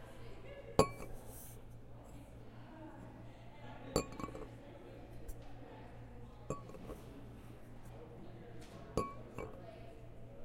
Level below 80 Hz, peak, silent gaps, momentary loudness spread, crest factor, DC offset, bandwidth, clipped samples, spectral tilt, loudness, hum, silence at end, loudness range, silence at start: -56 dBFS; -10 dBFS; none; 16 LU; 36 dB; under 0.1%; 16.5 kHz; under 0.1%; -5.5 dB/octave; -46 LUFS; none; 0 s; 9 LU; 0 s